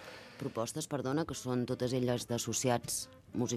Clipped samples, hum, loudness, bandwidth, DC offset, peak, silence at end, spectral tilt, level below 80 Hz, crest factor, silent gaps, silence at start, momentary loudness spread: under 0.1%; none; -35 LUFS; 15 kHz; under 0.1%; -16 dBFS; 0 s; -4.5 dB/octave; -66 dBFS; 20 dB; none; 0 s; 8 LU